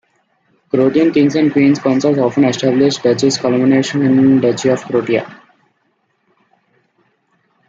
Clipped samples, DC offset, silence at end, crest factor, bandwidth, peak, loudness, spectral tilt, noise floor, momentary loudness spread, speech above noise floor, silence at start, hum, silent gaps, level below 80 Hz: under 0.1%; under 0.1%; 2.35 s; 14 dB; 7.8 kHz; 0 dBFS; -13 LUFS; -6 dB/octave; -63 dBFS; 5 LU; 51 dB; 0.75 s; none; none; -56 dBFS